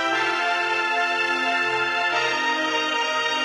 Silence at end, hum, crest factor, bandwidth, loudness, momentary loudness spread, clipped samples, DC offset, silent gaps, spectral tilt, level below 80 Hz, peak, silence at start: 0 s; none; 12 dB; 14 kHz; -21 LUFS; 1 LU; under 0.1%; under 0.1%; none; -1.5 dB/octave; -70 dBFS; -10 dBFS; 0 s